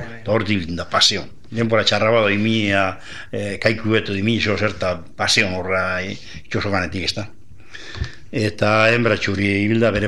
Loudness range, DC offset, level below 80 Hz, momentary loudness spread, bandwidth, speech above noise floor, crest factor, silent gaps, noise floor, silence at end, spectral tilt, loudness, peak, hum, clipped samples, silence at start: 4 LU; 2%; -44 dBFS; 15 LU; 12.5 kHz; 22 dB; 18 dB; none; -41 dBFS; 0 s; -4.5 dB/octave; -19 LUFS; -2 dBFS; none; under 0.1%; 0 s